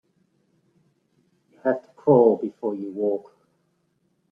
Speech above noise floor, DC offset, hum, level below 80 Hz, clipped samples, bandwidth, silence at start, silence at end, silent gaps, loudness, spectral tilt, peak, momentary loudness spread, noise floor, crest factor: 49 dB; under 0.1%; none; -70 dBFS; under 0.1%; 3.3 kHz; 1.65 s; 1.1 s; none; -23 LUFS; -11 dB/octave; -4 dBFS; 12 LU; -70 dBFS; 22 dB